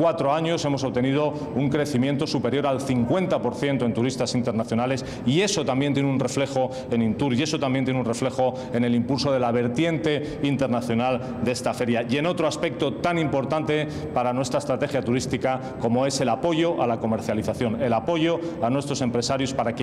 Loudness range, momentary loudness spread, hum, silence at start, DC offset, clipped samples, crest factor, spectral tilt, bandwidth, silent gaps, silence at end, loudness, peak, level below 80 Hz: 1 LU; 3 LU; none; 0 s; under 0.1%; under 0.1%; 14 dB; -5.5 dB/octave; 13.5 kHz; none; 0 s; -24 LUFS; -10 dBFS; -54 dBFS